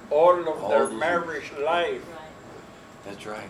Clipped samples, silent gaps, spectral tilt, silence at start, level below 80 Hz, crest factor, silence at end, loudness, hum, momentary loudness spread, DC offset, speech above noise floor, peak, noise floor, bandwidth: under 0.1%; none; -4.5 dB/octave; 0 s; -62 dBFS; 20 dB; 0 s; -24 LUFS; none; 24 LU; under 0.1%; 21 dB; -6 dBFS; -45 dBFS; 12.5 kHz